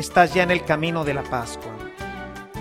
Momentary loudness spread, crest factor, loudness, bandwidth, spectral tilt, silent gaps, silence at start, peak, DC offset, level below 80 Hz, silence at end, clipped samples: 17 LU; 22 dB; -21 LUFS; 16 kHz; -5 dB/octave; none; 0 s; -2 dBFS; under 0.1%; -44 dBFS; 0 s; under 0.1%